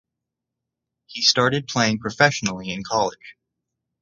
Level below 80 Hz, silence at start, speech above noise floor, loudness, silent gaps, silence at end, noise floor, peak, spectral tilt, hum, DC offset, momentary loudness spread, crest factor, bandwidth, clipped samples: -58 dBFS; 1.1 s; 62 dB; -20 LUFS; none; 0.7 s; -84 dBFS; 0 dBFS; -3.5 dB/octave; none; under 0.1%; 10 LU; 24 dB; 11 kHz; under 0.1%